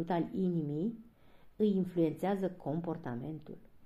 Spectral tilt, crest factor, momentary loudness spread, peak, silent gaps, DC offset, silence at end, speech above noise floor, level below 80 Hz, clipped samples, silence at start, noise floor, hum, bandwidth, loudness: -9 dB/octave; 16 dB; 12 LU; -20 dBFS; none; under 0.1%; 0 s; 24 dB; -66 dBFS; under 0.1%; 0 s; -58 dBFS; none; 13 kHz; -35 LUFS